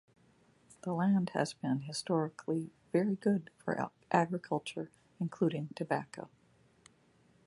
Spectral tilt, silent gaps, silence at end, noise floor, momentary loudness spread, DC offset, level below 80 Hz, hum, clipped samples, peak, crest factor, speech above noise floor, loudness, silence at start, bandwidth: -6.5 dB/octave; none; 1.2 s; -68 dBFS; 12 LU; under 0.1%; -76 dBFS; none; under 0.1%; -12 dBFS; 22 dB; 34 dB; -35 LUFS; 0.85 s; 11.5 kHz